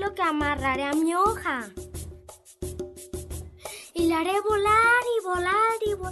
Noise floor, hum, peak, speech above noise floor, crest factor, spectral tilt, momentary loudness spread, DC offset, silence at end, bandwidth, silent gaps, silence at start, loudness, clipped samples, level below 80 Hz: -48 dBFS; none; -10 dBFS; 24 dB; 16 dB; -4.5 dB/octave; 19 LU; under 0.1%; 0 s; 12 kHz; none; 0 s; -24 LUFS; under 0.1%; -46 dBFS